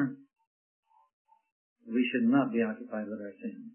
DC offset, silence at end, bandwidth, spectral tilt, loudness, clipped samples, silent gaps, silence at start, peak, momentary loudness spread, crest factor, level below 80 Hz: under 0.1%; 0.05 s; 3.2 kHz; -10 dB/octave; -31 LUFS; under 0.1%; 0.47-0.83 s, 1.13-1.25 s, 1.52-1.76 s; 0 s; -14 dBFS; 15 LU; 18 dB; -86 dBFS